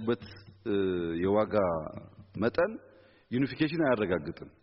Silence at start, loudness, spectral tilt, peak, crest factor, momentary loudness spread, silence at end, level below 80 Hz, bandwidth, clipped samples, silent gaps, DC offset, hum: 0 s; -30 LUFS; -5.5 dB/octave; -14 dBFS; 18 dB; 16 LU; 0.15 s; -60 dBFS; 5.8 kHz; under 0.1%; none; under 0.1%; none